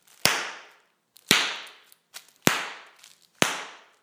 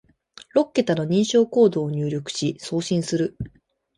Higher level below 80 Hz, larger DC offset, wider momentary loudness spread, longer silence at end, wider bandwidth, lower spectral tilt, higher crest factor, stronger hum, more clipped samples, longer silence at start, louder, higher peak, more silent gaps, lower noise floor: second, -66 dBFS vs -54 dBFS; neither; first, 23 LU vs 9 LU; second, 0.25 s vs 0.5 s; first, over 20 kHz vs 11.5 kHz; second, -1.5 dB/octave vs -6 dB/octave; first, 30 dB vs 18 dB; neither; neither; second, 0.25 s vs 0.55 s; second, -25 LUFS vs -22 LUFS; first, 0 dBFS vs -6 dBFS; neither; first, -60 dBFS vs -49 dBFS